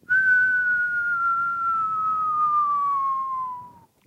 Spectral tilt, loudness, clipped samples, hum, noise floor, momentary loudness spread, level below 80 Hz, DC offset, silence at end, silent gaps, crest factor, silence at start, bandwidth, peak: -3.5 dB/octave; -22 LUFS; under 0.1%; none; -44 dBFS; 10 LU; -68 dBFS; under 0.1%; 0.35 s; none; 12 dB; 0.1 s; 8 kHz; -12 dBFS